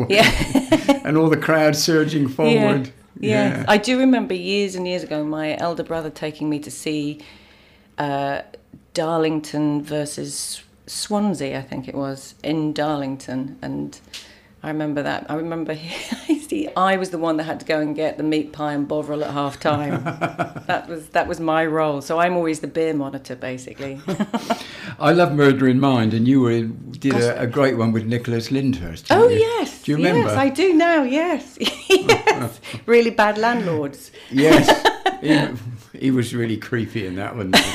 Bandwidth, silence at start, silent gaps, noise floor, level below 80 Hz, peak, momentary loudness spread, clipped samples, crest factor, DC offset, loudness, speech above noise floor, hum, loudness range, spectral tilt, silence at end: 16 kHz; 0 s; none; -51 dBFS; -46 dBFS; -4 dBFS; 14 LU; under 0.1%; 16 dB; under 0.1%; -20 LUFS; 31 dB; none; 9 LU; -5 dB/octave; 0 s